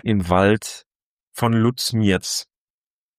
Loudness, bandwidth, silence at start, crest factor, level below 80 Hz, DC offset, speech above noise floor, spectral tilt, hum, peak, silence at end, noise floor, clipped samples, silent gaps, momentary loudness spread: -20 LUFS; 15.5 kHz; 0.05 s; 18 dB; -48 dBFS; under 0.1%; over 71 dB; -5 dB/octave; none; -2 dBFS; 0.75 s; under -90 dBFS; under 0.1%; 0.86-1.17 s, 1.23-1.32 s; 15 LU